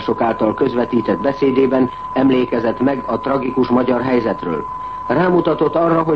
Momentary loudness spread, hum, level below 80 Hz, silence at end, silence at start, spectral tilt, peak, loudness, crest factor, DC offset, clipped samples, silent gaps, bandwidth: 6 LU; none; -46 dBFS; 0 s; 0 s; -9 dB/octave; -2 dBFS; -17 LUFS; 14 dB; 0.4%; under 0.1%; none; 6 kHz